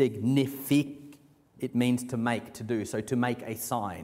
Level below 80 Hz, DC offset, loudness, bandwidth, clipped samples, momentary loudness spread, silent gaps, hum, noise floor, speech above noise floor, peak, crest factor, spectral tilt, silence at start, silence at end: -66 dBFS; under 0.1%; -30 LUFS; 16 kHz; under 0.1%; 7 LU; none; none; -56 dBFS; 27 dB; -12 dBFS; 18 dB; -6 dB/octave; 0 s; 0 s